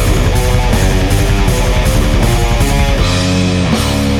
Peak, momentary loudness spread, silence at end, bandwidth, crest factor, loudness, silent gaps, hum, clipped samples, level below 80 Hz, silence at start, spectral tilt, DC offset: 0 dBFS; 1 LU; 0 s; 17 kHz; 10 dB; -13 LUFS; none; none; under 0.1%; -14 dBFS; 0 s; -5 dB/octave; under 0.1%